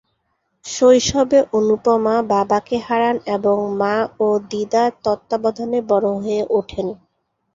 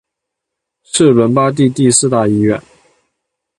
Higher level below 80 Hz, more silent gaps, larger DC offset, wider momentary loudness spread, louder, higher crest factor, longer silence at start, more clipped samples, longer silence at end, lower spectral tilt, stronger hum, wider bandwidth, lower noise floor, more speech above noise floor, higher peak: about the same, -50 dBFS vs -50 dBFS; neither; neither; about the same, 8 LU vs 7 LU; second, -18 LUFS vs -12 LUFS; about the same, 16 dB vs 14 dB; second, 0.65 s vs 0.95 s; neither; second, 0.6 s vs 1 s; about the same, -4.5 dB/octave vs -5 dB/octave; neither; second, 7.8 kHz vs 11.5 kHz; second, -70 dBFS vs -78 dBFS; second, 52 dB vs 67 dB; about the same, -2 dBFS vs 0 dBFS